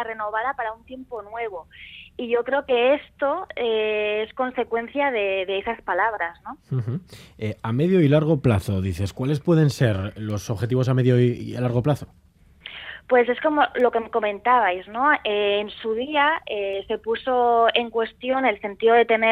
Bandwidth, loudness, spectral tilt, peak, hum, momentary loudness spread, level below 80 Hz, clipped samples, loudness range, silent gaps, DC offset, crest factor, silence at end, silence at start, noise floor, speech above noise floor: 14 kHz; -22 LUFS; -7 dB/octave; -4 dBFS; none; 13 LU; -54 dBFS; under 0.1%; 4 LU; none; under 0.1%; 18 dB; 0 s; 0 s; -44 dBFS; 23 dB